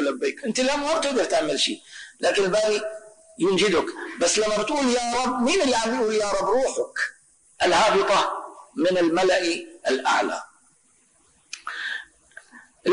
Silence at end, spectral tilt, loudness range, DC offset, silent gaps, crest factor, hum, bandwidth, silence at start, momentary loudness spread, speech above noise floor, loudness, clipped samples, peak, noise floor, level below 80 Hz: 0 s; -2.5 dB/octave; 3 LU; under 0.1%; none; 12 dB; none; 10.5 kHz; 0 s; 12 LU; 39 dB; -23 LUFS; under 0.1%; -12 dBFS; -61 dBFS; -56 dBFS